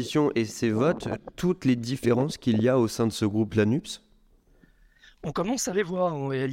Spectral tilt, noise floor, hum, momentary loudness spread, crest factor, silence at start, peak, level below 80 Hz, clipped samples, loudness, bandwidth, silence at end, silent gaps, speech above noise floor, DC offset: -6 dB/octave; -60 dBFS; none; 8 LU; 16 dB; 0 s; -10 dBFS; -56 dBFS; under 0.1%; -26 LUFS; 16.5 kHz; 0 s; none; 35 dB; under 0.1%